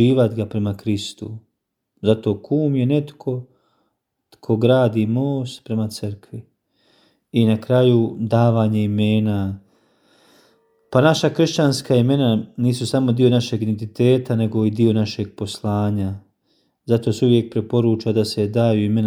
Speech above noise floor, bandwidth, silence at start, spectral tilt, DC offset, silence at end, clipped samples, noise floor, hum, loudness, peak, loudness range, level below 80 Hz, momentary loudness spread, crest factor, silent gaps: 54 dB; 14 kHz; 0 s; -7 dB/octave; under 0.1%; 0 s; under 0.1%; -72 dBFS; none; -19 LUFS; -2 dBFS; 4 LU; -60 dBFS; 11 LU; 18 dB; none